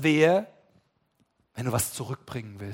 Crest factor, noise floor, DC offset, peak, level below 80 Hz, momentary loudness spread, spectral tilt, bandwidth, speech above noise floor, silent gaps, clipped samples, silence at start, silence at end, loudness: 20 dB; -71 dBFS; under 0.1%; -6 dBFS; -60 dBFS; 20 LU; -5 dB/octave; 16.5 kHz; 45 dB; none; under 0.1%; 0 s; 0 s; -27 LUFS